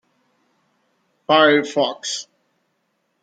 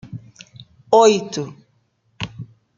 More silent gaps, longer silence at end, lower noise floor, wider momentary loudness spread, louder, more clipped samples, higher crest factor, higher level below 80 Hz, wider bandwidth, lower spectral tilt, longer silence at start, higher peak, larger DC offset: neither; first, 1 s vs 0.35 s; first, -70 dBFS vs -64 dBFS; second, 15 LU vs 24 LU; about the same, -18 LUFS vs -16 LUFS; neither; about the same, 20 dB vs 20 dB; second, -74 dBFS vs -58 dBFS; first, 9.2 kHz vs 7.6 kHz; second, -3 dB/octave vs -4.5 dB/octave; first, 1.3 s vs 0.1 s; about the same, -2 dBFS vs -2 dBFS; neither